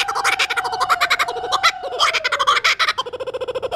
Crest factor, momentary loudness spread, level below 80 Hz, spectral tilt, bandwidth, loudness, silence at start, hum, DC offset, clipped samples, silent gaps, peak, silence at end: 16 dB; 10 LU; -54 dBFS; 0.5 dB/octave; 15.5 kHz; -18 LUFS; 0 s; none; under 0.1%; under 0.1%; none; -4 dBFS; 0 s